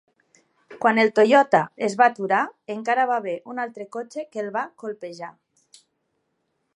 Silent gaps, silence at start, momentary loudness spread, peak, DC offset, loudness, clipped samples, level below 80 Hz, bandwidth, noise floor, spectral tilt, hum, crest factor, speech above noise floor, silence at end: none; 0.7 s; 17 LU; -2 dBFS; under 0.1%; -22 LUFS; under 0.1%; -82 dBFS; 11.5 kHz; -74 dBFS; -5 dB/octave; none; 22 dB; 52 dB; 1.45 s